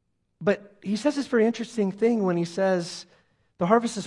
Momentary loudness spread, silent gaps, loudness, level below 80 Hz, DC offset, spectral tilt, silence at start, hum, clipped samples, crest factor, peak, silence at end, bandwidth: 8 LU; none; -25 LUFS; -72 dBFS; under 0.1%; -6 dB/octave; 0.4 s; none; under 0.1%; 20 dB; -6 dBFS; 0 s; 11.5 kHz